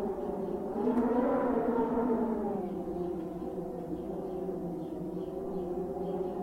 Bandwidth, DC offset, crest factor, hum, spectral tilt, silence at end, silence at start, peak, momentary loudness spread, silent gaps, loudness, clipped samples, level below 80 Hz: 15.5 kHz; under 0.1%; 16 dB; none; -9 dB/octave; 0 s; 0 s; -16 dBFS; 9 LU; none; -34 LUFS; under 0.1%; -56 dBFS